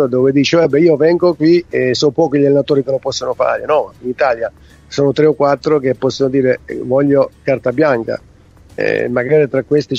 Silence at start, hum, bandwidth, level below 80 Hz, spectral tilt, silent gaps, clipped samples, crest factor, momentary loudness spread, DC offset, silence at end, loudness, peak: 0 s; none; 7.8 kHz; -50 dBFS; -6 dB/octave; none; under 0.1%; 14 dB; 8 LU; under 0.1%; 0 s; -14 LUFS; 0 dBFS